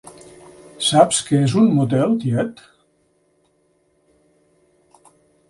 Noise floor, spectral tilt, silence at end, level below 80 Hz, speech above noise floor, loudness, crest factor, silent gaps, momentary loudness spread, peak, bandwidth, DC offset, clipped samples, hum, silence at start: -63 dBFS; -5.5 dB/octave; 2.95 s; -60 dBFS; 46 dB; -17 LUFS; 20 dB; none; 7 LU; 0 dBFS; 11.5 kHz; under 0.1%; under 0.1%; none; 0.8 s